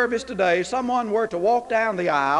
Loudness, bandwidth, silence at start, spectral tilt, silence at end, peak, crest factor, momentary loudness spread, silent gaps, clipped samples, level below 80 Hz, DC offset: -22 LUFS; 11 kHz; 0 s; -4.5 dB/octave; 0 s; -8 dBFS; 14 dB; 3 LU; none; under 0.1%; -56 dBFS; under 0.1%